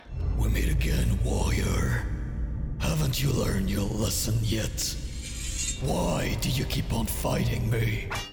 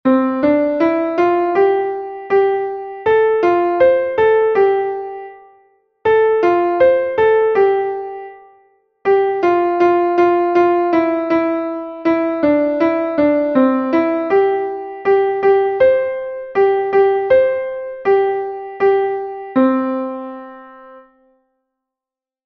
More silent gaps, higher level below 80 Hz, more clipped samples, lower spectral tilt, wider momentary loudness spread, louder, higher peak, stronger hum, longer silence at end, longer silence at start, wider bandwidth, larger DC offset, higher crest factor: neither; first, -32 dBFS vs -56 dBFS; neither; second, -5 dB/octave vs -7.5 dB/octave; second, 7 LU vs 11 LU; second, -28 LUFS vs -15 LUFS; second, -16 dBFS vs -2 dBFS; neither; second, 0 s vs 1.45 s; about the same, 0 s vs 0.05 s; first, over 20 kHz vs 6.2 kHz; neither; about the same, 12 dB vs 14 dB